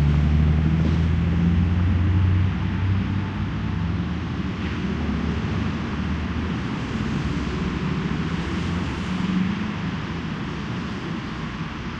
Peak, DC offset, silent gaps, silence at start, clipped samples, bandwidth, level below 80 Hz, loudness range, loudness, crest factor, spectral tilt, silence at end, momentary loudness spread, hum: -8 dBFS; under 0.1%; none; 0 s; under 0.1%; 8 kHz; -30 dBFS; 5 LU; -24 LUFS; 14 dB; -7.5 dB/octave; 0 s; 9 LU; none